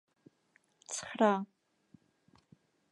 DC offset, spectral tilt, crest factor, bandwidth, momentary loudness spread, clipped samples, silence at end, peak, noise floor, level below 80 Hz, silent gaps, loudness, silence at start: under 0.1%; -4.5 dB/octave; 24 dB; 11.5 kHz; 20 LU; under 0.1%; 1.45 s; -14 dBFS; -73 dBFS; -84 dBFS; none; -33 LUFS; 0.9 s